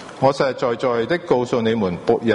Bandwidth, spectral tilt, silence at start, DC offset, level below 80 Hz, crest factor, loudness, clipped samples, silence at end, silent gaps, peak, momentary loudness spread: 10.5 kHz; -6.5 dB/octave; 0 s; under 0.1%; -54 dBFS; 16 dB; -20 LUFS; under 0.1%; 0 s; none; -4 dBFS; 3 LU